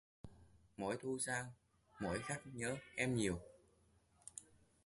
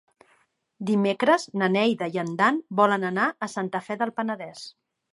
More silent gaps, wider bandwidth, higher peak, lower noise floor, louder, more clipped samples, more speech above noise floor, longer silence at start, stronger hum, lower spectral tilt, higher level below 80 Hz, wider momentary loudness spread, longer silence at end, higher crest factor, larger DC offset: neither; about the same, 11.5 kHz vs 11.5 kHz; second, -24 dBFS vs -6 dBFS; first, -74 dBFS vs -66 dBFS; second, -43 LUFS vs -24 LUFS; neither; second, 31 dB vs 42 dB; second, 0.25 s vs 0.8 s; neither; about the same, -4.5 dB/octave vs -5.5 dB/octave; first, -66 dBFS vs -76 dBFS; first, 22 LU vs 12 LU; about the same, 0.45 s vs 0.45 s; about the same, 22 dB vs 20 dB; neither